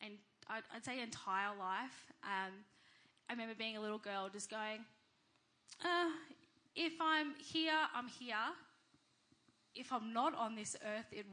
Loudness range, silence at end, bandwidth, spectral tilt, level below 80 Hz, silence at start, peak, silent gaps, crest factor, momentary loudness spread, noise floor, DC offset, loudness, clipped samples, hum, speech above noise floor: 6 LU; 0 s; 10 kHz; -2.5 dB/octave; under -90 dBFS; 0 s; -24 dBFS; none; 20 dB; 16 LU; -77 dBFS; under 0.1%; -42 LUFS; under 0.1%; none; 35 dB